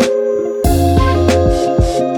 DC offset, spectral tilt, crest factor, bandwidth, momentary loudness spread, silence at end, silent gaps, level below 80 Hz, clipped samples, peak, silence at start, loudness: under 0.1%; -6.5 dB/octave; 12 dB; 19.5 kHz; 4 LU; 0 s; none; -20 dBFS; under 0.1%; 0 dBFS; 0 s; -13 LUFS